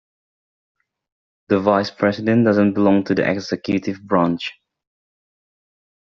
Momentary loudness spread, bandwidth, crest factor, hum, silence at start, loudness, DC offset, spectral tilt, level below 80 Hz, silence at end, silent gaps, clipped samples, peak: 7 LU; 7 kHz; 20 dB; none; 1.5 s; -18 LUFS; under 0.1%; -5.5 dB/octave; -60 dBFS; 1.5 s; none; under 0.1%; -2 dBFS